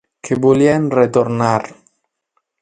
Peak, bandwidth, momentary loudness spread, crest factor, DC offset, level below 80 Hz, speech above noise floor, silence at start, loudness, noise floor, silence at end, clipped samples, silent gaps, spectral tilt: 0 dBFS; 9.4 kHz; 9 LU; 16 dB; under 0.1%; -54 dBFS; 55 dB; 0.25 s; -15 LUFS; -69 dBFS; 0.9 s; under 0.1%; none; -7 dB/octave